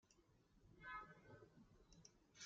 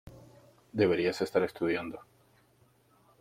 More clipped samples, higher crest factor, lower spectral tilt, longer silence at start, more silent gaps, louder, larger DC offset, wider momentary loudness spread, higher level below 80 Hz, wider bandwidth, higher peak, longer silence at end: neither; about the same, 22 dB vs 20 dB; second, -2.5 dB/octave vs -6 dB/octave; about the same, 0.05 s vs 0.05 s; neither; second, -61 LUFS vs -31 LUFS; neither; about the same, 13 LU vs 14 LU; second, -78 dBFS vs -66 dBFS; second, 7.4 kHz vs 16 kHz; second, -42 dBFS vs -14 dBFS; second, 0 s vs 1.2 s